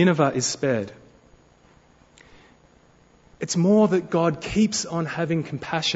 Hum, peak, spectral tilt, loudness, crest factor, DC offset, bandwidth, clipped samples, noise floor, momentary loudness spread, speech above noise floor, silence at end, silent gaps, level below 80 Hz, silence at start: none; -6 dBFS; -5 dB/octave; -23 LUFS; 20 dB; under 0.1%; 8 kHz; under 0.1%; -56 dBFS; 9 LU; 34 dB; 0 s; none; -54 dBFS; 0 s